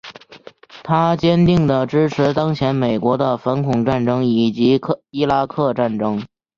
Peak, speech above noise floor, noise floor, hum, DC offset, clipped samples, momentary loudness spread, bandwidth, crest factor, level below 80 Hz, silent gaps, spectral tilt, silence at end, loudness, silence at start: -2 dBFS; 26 dB; -43 dBFS; none; under 0.1%; under 0.1%; 6 LU; 7.2 kHz; 16 dB; -48 dBFS; none; -8 dB/octave; 0.3 s; -17 LUFS; 0.05 s